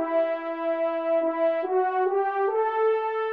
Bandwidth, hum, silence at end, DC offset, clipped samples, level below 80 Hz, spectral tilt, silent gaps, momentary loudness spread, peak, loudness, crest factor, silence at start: 5.2 kHz; none; 0 s; under 0.1%; under 0.1%; -82 dBFS; -5 dB/octave; none; 3 LU; -14 dBFS; -25 LUFS; 10 dB; 0 s